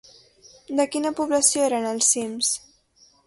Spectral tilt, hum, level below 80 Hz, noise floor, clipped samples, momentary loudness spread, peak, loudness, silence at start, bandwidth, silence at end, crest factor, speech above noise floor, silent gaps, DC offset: -1 dB/octave; none; -68 dBFS; -58 dBFS; under 0.1%; 7 LU; -4 dBFS; -22 LUFS; 0.7 s; 12 kHz; 0.7 s; 20 dB; 36 dB; none; under 0.1%